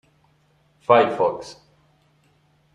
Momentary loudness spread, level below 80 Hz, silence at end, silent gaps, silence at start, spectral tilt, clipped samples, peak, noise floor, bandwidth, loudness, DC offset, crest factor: 19 LU; -66 dBFS; 1.2 s; none; 0.9 s; -5.5 dB/octave; under 0.1%; -2 dBFS; -62 dBFS; 10.5 kHz; -19 LUFS; under 0.1%; 22 dB